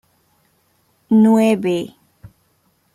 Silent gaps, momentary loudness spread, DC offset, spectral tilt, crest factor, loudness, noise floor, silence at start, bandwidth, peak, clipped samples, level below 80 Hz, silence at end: none; 12 LU; under 0.1%; -7 dB/octave; 16 dB; -15 LUFS; -62 dBFS; 1.1 s; 14 kHz; -4 dBFS; under 0.1%; -60 dBFS; 0.65 s